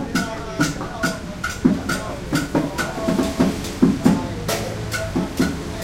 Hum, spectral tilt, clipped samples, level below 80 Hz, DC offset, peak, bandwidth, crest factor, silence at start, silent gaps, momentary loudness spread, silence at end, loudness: none; -5 dB/octave; under 0.1%; -36 dBFS; under 0.1%; -2 dBFS; 16.5 kHz; 20 dB; 0 s; none; 6 LU; 0 s; -22 LUFS